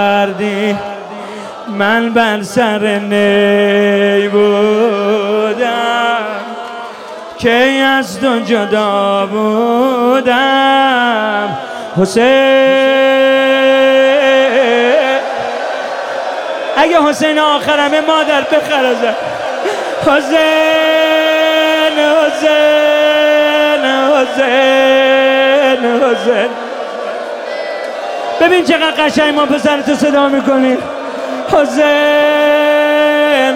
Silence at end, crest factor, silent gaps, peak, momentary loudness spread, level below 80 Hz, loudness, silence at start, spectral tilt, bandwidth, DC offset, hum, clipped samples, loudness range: 0 s; 10 dB; none; 0 dBFS; 11 LU; -54 dBFS; -11 LUFS; 0 s; -4 dB/octave; 16.5 kHz; under 0.1%; none; under 0.1%; 4 LU